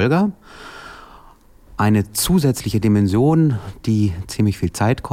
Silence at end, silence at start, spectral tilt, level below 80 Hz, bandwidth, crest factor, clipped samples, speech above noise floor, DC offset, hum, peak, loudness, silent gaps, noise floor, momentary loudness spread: 0 s; 0 s; -6 dB/octave; -40 dBFS; 16.5 kHz; 12 dB; under 0.1%; 29 dB; under 0.1%; none; -6 dBFS; -18 LUFS; none; -46 dBFS; 21 LU